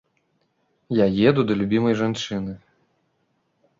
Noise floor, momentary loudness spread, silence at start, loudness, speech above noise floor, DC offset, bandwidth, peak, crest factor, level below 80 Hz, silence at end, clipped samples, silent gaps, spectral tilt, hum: -70 dBFS; 13 LU; 0.9 s; -21 LUFS; 49 dB; under 0.1%; 7.6 kHz; -4 dBFS; 20 dB; -54 dBFS; 1.25 s; under 0.1%; none; -6.5 dB/octave; none